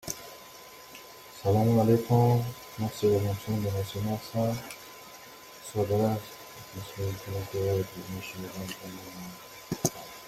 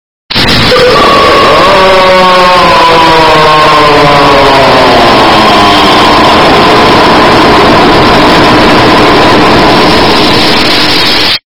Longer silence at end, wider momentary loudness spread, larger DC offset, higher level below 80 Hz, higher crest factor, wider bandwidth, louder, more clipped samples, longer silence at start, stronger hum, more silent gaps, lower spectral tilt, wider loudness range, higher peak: about the same, 0 s vs 0 s; first, 22 LU vs 1 LU; second, under 0.1% vs 7%; second, -60 dBFS vs -24 dBFS; first, 20 dB vs 4 dB; second, 16 kHz vs over 20 kHz; second, -29 LUFS vs -2 LUFS; second, under 0.1% vs 20%; second, 0.05 s vs 0.3 s; neither; neither; first, -6 dB/octave vs -4.5 dB/octave; first, 8 LU vs 1 LU; second, -10 dBFS vs 0 dBFS